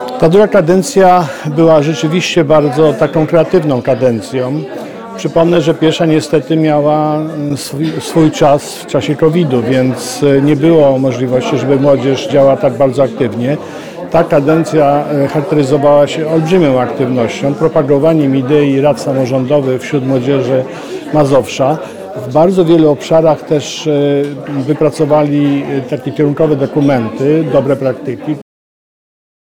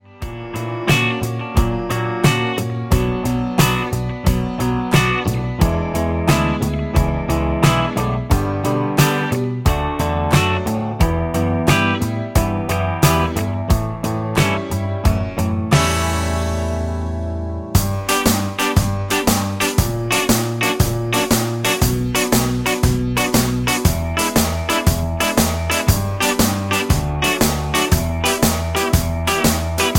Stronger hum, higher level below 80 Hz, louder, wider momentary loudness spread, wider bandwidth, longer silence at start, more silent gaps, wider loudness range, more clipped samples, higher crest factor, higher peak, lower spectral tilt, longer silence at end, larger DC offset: neither; second, -46 dBFS vs -28 dBFS; first, -11 LUFS vs -18 LUFS; first, 8 LU vs 5 LU; about the same, 18 kHz vs 17 kHz; second, 0 s vs 0.15 s; neither; about the same, 2 LU vs 2 LU; neither; second, 10 dB vs 18 dB; about the same, 0 dBFS vs 0 dBFS; first, -6.5 dB/octave vs -4.5 dB/octave; first, 1 s vs 0 s; first, 0.5% vs under 0.1%